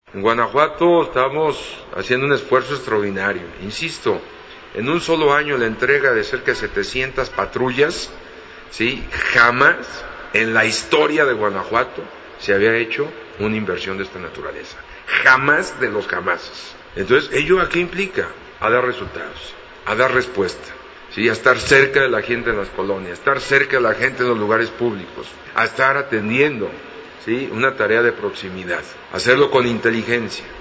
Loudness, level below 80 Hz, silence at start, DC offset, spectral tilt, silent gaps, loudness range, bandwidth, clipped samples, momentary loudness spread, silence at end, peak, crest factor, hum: -18 LUFS; -46 dBFS; 0.15 s; under 0.1%; -4.5 dB/octave; none; 4 LU; 8 kHz; under 0.1%; 16 LU; 0 s; 0 dBFS; 18 dB; none